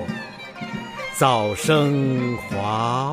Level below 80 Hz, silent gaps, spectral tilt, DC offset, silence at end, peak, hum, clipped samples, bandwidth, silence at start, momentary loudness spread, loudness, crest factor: -54 dBFS; none; -5.5 dB/octave; under 0.1%; 0 s; -4 dBFS; none; under 0.1%; 15.5 kHz; 0 s; 13 LU; -22 LUFS; 18 dB